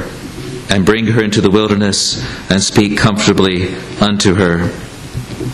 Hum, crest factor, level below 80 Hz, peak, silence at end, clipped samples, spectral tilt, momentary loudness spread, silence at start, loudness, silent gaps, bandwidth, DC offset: none; 14 dB; -36 dBFS; 0 dBFS; 0 s; under 0.1%; -4.5 dB/octave; 14 LU; 0 s; -13 LUFS; none; 13 kHz; under 0.1%